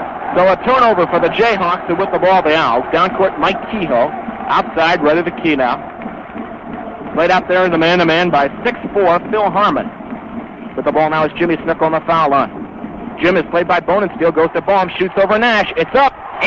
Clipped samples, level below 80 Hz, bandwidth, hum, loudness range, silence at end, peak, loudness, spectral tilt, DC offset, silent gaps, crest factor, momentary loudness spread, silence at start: under 0.1%; -44 dBFS; 7.4 kHz; none; 3 LU; 0 s; 0 dBFS; -14 LUFS; -6.5 dB/octave; 0.1%; none; 14 dB; 15 LU; 0 s